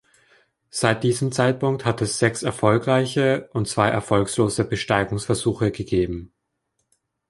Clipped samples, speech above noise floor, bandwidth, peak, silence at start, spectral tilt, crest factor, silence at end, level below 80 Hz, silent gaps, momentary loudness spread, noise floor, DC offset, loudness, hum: under 0.1%; 53 dB; 11.5 kHz; -2 dBFS; 0.75 s; -5.5 dB/octave; 20 dB; 1.05 s; -48 dBFS; none; 5 LU; -75 dBFS; under 0.1%; -22 LUFS; none